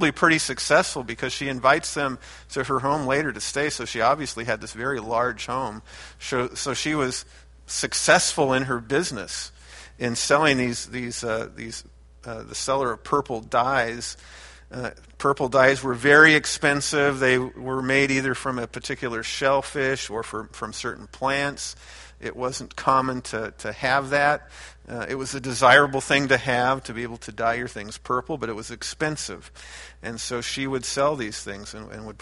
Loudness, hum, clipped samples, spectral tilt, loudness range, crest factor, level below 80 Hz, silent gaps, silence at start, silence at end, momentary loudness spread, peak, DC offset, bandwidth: -23 LUFS; none; under 0.1%; -3.5 dB/octave; 8 LU; 24 dB; -50 dBFS; none; 0 s; 0.05 s; 17 LU; 0 dBFS; under 0.1%; 11.5 kHz